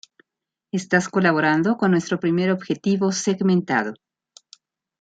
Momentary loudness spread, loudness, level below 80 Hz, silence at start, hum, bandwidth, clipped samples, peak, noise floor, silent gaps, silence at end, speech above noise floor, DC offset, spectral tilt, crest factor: 5 LU; -21 LUFS; -66 dBFS; 0.75 s; none; 9 kHz; under 0.1%; -2 dBFS; -86 dBFS; none; 1.05 s; 66 dB; under 0.1%; -5.5 dB/octave; 20 dB